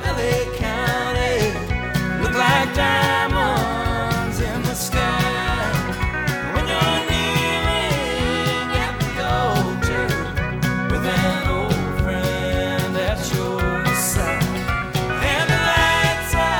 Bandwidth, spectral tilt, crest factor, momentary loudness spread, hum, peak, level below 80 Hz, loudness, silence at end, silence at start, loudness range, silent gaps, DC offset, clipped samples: 19 kHz; -4.5 dB/octave; 18 dB; 6 LU; none; -2 dBFS; -30 dBFS; -20 LUFS; 0 s; 0 s; 2 LU; none; under 0.1%; under 0.1%